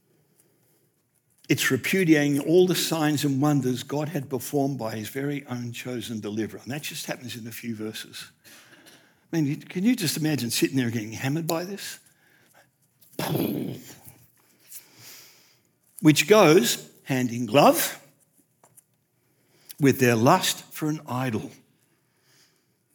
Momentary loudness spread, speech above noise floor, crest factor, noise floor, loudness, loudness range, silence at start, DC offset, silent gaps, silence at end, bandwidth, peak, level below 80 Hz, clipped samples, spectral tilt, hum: 20 LU; 45 dB; 22 dB; -69 dBFS; -24 LUFS; 13 LU; 1.5 s; under 0.1%; none; 1.4 s; over 20 kHz; -4 dBFS; -78 dBFS; under 0.1%; -4.5 dB/octave; none